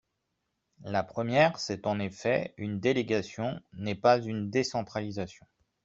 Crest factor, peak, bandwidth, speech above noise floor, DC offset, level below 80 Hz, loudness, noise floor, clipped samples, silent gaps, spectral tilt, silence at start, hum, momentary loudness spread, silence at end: 22 dB; -8 dBFS; 7.8 kHz; 52 dB; under 0.1%; -66 dBFS; -30 LUFS; -81 dBFS; under 0.1%; none; -5.5 dB/octave; 0.8 s; none; 12 LU; 0.5 s